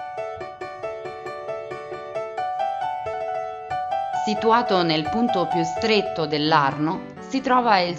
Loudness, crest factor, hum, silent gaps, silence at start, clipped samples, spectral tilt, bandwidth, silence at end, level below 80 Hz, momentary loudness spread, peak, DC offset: -23 LUFS; 20 dB; none; none; 0 s; under 0.1%; -5.5 dB/octave; 9.2 kHz; 0 s; -58 dBFS; 14 LU; -4 dBFS; under 0.1%